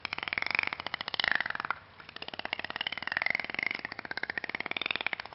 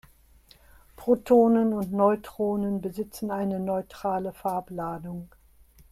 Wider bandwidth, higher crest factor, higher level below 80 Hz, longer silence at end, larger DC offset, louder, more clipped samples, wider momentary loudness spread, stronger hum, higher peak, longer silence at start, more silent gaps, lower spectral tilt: second, 6 kHz vs 15.5 kHz; first, 26 dB vs 18 dB; second, -66 dBFS vs -58 dBFS; second, 0 s vs 0.65 s; neither; second, -33 LUFS vs -26 LUFS; neither; second, 9 LU vs 14 LU; neither; about the same, -10 dBFS vs -8 dBFS; second, 0 s vs 1 s; neither; second, 1 dB/octave vs -8 dB/octave